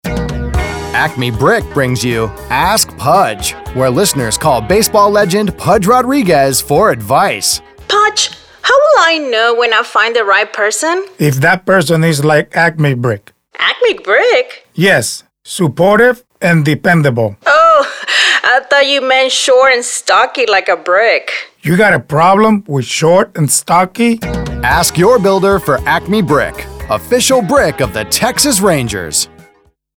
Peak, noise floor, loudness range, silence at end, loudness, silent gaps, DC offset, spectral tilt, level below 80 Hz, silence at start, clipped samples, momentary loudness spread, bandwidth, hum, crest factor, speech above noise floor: 0 dBFS; -50 dBFS; 3 LU; 0.7 s; -11 LUFS; none; under 0.1%; -4 dB/octave; -32 dBFS; 0.05 s; under 0.1%; 8 LU; over 20 kHz; none; 12 dB; 40 dB